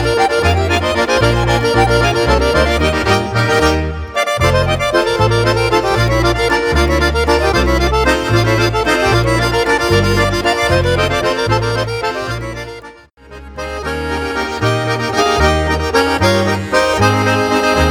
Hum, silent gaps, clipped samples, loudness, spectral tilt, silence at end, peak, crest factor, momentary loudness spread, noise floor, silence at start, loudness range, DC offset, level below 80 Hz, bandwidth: none; none; under 0.1%; -14 LUFS; -5 dB/octave; 0 s; 0 dBFS; 14 dB; 7 LU; -38 dBFS; 0 s; 6 LU; under 0.1%; -24 dBFS; 18 kHz